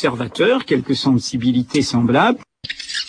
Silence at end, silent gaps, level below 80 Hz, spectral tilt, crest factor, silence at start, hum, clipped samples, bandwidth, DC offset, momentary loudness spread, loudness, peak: 0 s; none; -52 dBFS; -5 dB/octave; 14 dB; 0 s; none; under 0.1%; 10.5 kHz; under 0.1%; 10 LU; -17 LUFS; -4 dBFS